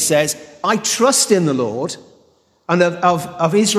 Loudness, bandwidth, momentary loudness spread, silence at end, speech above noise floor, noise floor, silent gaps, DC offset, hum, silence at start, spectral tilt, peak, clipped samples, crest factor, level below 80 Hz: -16 LUFS; 14.5 kHz; 11 LU; 0 s; 40 dB; -56 dBFS; none; under 0.1%; none; 0 s; -3.5 dB/octave; -2 dBFS; under 0.1%; 16 dB; -60 dBFS